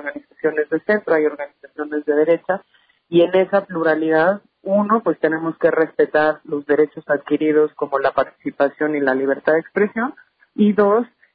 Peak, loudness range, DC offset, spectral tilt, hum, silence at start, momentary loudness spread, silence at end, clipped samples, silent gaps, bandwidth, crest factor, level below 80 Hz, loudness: -4 dBFS; 2 LU; under 0.1%; -10 dB/octave; none; 0 s; 9 LU; 0.3 s; under 0.1%; none; 4.9 kHz; 14 dB; -64 dBFS; -19 LUFS